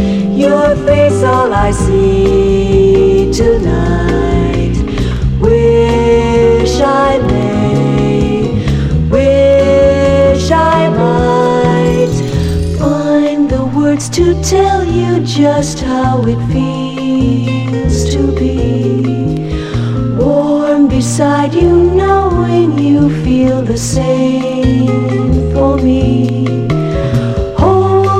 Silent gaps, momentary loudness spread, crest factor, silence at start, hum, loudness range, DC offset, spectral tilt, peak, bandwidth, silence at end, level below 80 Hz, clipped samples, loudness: none; 5 LU; 10 dB; 0 s; none; 3 LU; under 0.1%; -7 dB/octave; 0 dBFS; 14 kHz; 0 s; -22 dBFS; under 0.1%; -11 LUFS